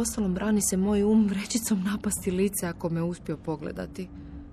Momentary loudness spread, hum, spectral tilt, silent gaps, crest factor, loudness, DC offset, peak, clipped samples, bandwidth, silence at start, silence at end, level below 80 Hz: 13 LU; none; -5 dB/octave; none; 14 dB; -27 LUFS; under 0.1%; -14 dBFS; under 0.1%; 14.5 kHz; 0 s; 0 s; -48 dBFS